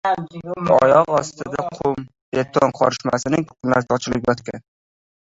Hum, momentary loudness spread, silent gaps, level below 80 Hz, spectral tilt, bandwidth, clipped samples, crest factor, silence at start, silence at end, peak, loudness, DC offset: none; 12 LU; 2.22-2.32 s; -52 dBFS; -5.5 dB/octave; 8 kHz; under 0.1%; 18 dB; 0.05 s; 0.65 s; -2 dBFS; -19 LUFS; under 0.1%